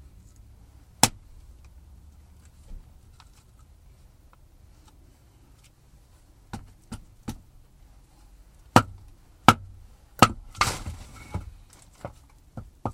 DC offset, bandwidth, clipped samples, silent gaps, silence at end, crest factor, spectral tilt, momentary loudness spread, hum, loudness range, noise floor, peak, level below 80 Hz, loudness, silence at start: under 0.1%; 16 kHz; under 0.1%; none; 0 s; 30 dB; -3.5 dB/octave; 27 LU; none; 22 LU; -55 dBFS; 0 dBFS; -48 dBFS; -24 LUFS; 1.05 s